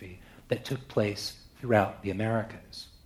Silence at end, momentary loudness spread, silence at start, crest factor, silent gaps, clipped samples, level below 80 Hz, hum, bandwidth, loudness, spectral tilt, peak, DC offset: 0.15 s; 18 LU; 0 s; 22 dB; none; under 0.1%; -58 dBFS; none; 15.5 kHz; -31 LUFS; -6 dB/octave; -10 dBFS; under 0.1%